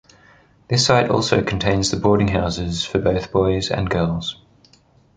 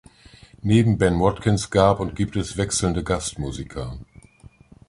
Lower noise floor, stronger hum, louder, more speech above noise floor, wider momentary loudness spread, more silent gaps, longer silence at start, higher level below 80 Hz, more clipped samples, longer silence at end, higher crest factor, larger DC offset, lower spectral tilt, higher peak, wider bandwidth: first, -54 dBFS vs -49 dBFS; neither; first, -19 LUFS vs -22 LUFS; first, 36 dB vs 28 dB; second, 7 LU vs 14 LU; neither; about the same, 0.7 s vs 0.65 s; about the same, -38 dBFS vs -38 dBFS; neither; about the same, 0.85 s vs 0.85 s; about the same, 18 dB vs 20 dB; neither; about the same, -5 dB/octave vs -5.5 dB/octave; about the same, -2 dBFS vs -2 dBFS; second, 9.6 kHz vs 11.5 kHz